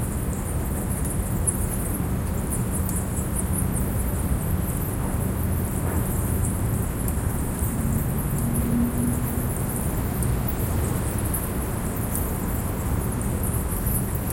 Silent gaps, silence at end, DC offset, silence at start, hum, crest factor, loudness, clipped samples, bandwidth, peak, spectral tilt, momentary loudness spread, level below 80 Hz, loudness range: none; 0 s; under 0.1%; 0 s; none; 16 dB; -26 LUFS; under 0.1%; 17 kHz; -8 dBFS; -6 dB/octave; 3 LU; -30 dBFS; 1 LU